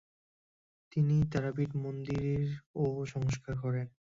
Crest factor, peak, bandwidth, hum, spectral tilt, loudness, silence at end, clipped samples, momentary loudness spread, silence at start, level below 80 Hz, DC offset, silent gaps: 16 dB; -18 dBFS; 7.6 kHz; none; -8 dB/octave; -34 LUFS; 0.25 s; under 0.1%; 8 LU; 0.95 s; -56 dBFS; under 0.1%; 2.66-2.74 s